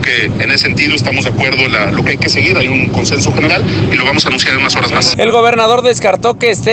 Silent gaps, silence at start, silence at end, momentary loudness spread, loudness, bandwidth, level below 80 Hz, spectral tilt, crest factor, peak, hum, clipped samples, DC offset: none; 0 s; 0 s; 3 LU; -10 LUFS; 9.6 kHz; -36 dBFS; -4 dB/octave; 10 dB; 0 dBFS; none; under 0.1%; under 0.1%